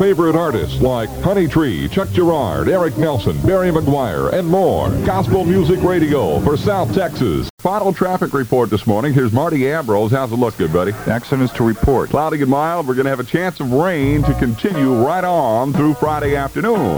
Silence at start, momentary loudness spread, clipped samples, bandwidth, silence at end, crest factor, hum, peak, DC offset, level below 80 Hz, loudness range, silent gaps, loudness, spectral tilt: 0 s; 4 LU; under 0.1%; over 20 kHz; 0 s; 16 dB; none; 0 dBFS; under 0.1%; -34 dBFS; 1 LU; 7.50-7.58 s; -16 LUFS; -7 dB/octave